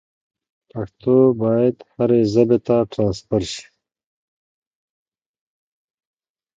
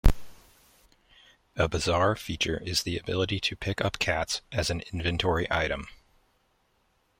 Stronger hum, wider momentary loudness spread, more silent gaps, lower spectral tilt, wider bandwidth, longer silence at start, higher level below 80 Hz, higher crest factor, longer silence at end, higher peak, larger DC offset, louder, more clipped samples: neither; first, 16 LU vs 5 LU; neither; first, -7.5 dB/octave vs -4 dB/octave; second, 9 kHz vs 16.5 kHz; first, 0.75 s vs 0.05 s; second, -52 dBFS vs -36 dBFS; second, 18 dB vs 24 dB; first, 2.95 s vs 1.3 s; first, -2 dBFS vs -6 dBFS; neither; first, -18 LUFS vs -28 LUFS; neither